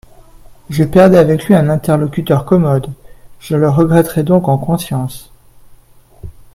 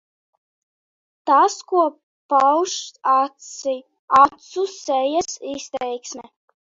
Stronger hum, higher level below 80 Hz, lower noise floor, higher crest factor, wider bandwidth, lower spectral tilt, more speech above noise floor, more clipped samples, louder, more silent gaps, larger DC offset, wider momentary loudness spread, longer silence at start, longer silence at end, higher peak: neither; first, -40 dBFS vs -64 dBFS; second, -42 dBFS vs under -90 dBFS; second, 14 dB vs 20 dB; first, 16 kHz vs 7.8 kHz; first, -7.5 dB/octave vs -2 dB/octave; second, 31 dB vs over 70 dB; neither; first, -12 LUFS vs -20 LUFS; second, none vs 2.03-2.29 s, 3.99-4.08 s; neither; about the same, 12 LU vs 14 LU; second, 0.5 s vs 1.25 s; second, 0.25 s vs 0.55 s; about the same, 0 dBFS vs -2 dBFS